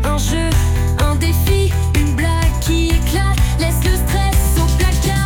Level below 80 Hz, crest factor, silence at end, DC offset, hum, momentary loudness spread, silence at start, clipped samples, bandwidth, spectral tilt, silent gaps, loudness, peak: -18 dBFS; 10 dB; 0 s; under 0.1%; none; 2 LU; 0 s; under 0.1%; 18 kHz; -5 dB/octave; none; -16 LUFS; -4 dBFS